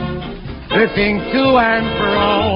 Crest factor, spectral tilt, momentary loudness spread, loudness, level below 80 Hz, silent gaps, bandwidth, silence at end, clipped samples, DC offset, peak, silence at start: 16 dB; -11 dB/octave; 14 LU; -15 LUFS; -34 dBFS; none; 5.6 kHz; 0 s; under 0.1%; under 0.1%; 0 dBFS; 0 s